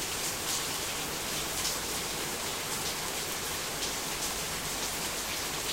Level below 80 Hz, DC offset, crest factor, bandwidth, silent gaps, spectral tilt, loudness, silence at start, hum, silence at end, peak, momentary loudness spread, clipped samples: -52 dBFS; under 0.1%; 18 dB; 16 kHz; none; -1 dB/octave; -32 LUFS; 0 s; none; 0 s; -16 dBFS; 2 LU; under 0.1%